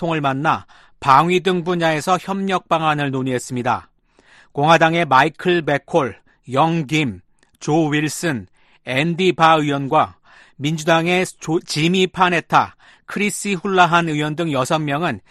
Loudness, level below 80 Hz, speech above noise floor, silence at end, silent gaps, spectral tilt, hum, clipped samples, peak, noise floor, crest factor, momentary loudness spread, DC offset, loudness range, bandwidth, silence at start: -18 LUFS; -56 dBFS; 34 dB; 0.1 s; none; -5 dB/octave; none; under 0.1%; 0 dBFS; -52 dBFS; 18 dB; 10 LU; under 0.1%; 3 LU; 13 kHz; 0 s